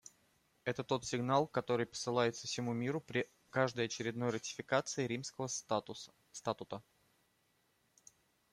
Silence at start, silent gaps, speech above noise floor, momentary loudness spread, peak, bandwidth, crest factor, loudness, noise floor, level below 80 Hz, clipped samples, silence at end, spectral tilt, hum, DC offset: 0.65 s; none; 39 dB; 10 LU; -18 dBFS; 14.5 kHz; 22 dB; -38 LUFS; -77 dBFS; -76 dBFS; under 0.1%; 1.7 s; -4.5 dB/octave; none; under 0.1%